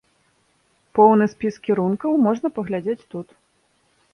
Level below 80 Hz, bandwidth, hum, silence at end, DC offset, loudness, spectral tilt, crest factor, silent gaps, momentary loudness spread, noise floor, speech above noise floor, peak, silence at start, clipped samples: -64 dBFS; 6.6 kHz; none; 0.9 s; under 0.1%; -20 LUFS; -8.5 dB/octave; 20 dB; none; 14 LU; -64 dBFS; 45 dB; -2 dBFS; 0.95 s; under 0.1%